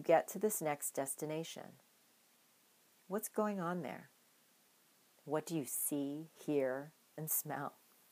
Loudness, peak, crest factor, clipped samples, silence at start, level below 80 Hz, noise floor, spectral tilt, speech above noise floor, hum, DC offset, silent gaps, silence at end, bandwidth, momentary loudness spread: -39 LUFS; -16 dBFS; 24 dB; under 0.1%; 0 s; under -90 dBFS; -71 dBFS; -4.5 dB/octave; 32 dB; none; under 0.1%; none; 0.4 s; 15.5 kHz; 11 LU